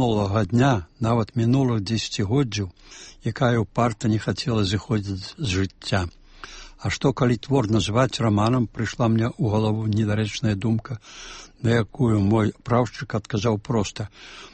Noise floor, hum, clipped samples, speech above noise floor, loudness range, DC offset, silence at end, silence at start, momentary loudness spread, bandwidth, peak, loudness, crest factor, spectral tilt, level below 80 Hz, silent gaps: -42 dBFS; none; under 0.1%; 19 dB; 3 LU; under 0.1%; 0.05 s; 0 s; 14 LU; 8.8 kHz; -8 dBFS; -23 LUFS; 16 dB; -6.5 dB/octave; -46 dBFS; none